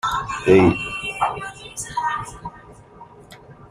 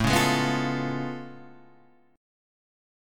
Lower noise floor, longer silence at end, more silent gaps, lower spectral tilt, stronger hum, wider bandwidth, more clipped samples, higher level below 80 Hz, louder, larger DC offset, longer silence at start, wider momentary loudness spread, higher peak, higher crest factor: second, -44 dBFS vs -59 dBFS; second, 0.05 s vs 0.95 s; neither; about the same, -5.5 dB/octave vs -4.5 dB/octave; neither; second, 14.5 kHz vs 17.5 kHz; neither; about the same, -46 dBFS vs -48 dBFS; first, -20 LUFS vs -26 LUFS; neither; about the same, 0.05 s vs 0 s; about the same, 19 LU vs 17 LU; first, -2 dBFS vs -8 dBFS; about the same, 20 dB vs 20 dB